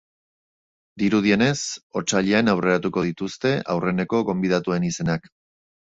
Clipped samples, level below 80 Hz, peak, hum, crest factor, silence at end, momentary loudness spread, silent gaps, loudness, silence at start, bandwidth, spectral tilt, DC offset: under 0.1%; -54 dBFS; -4 dBFS; none; 18 dB; 0.8 s; 8 LU; 1.83-1.90 s; -22 LUFS; 0.95 s; 8 kHz; -5 dB/octave; under 0.1%